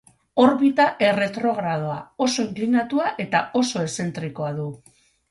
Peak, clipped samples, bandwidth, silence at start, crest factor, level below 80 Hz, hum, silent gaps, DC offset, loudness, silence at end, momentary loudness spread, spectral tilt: -4 dBFS; under 0.1%; 11.5 kHz; 0.35 s; 18 dB; -62 dBFS; none; none; under 0.1%; -22 LUFS; 0.55 s; 10 LU; -5 dB/octave